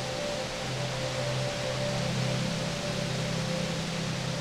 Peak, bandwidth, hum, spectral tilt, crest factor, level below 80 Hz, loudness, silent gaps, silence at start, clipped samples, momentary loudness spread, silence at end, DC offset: -18 dBFS; 15 kHz; none; -4.5 dB/octave; 14 dB; -52 dBFS; -31 LUFS; none; 0 s; under 0.1%; 3 LU; 0 s; under 0.1%